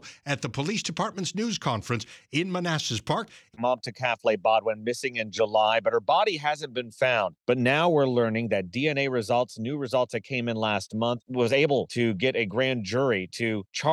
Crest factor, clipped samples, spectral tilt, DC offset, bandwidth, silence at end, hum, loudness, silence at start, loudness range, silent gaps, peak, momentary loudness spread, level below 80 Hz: 16 dB; under 0.1%; -5 dB/octave; under 0.1%; 12.5 kHz; 0 s; none; -26 LUFS; 0.05 s; 4 LU; none; -10 dBFS; 7 LU; -66 dBFS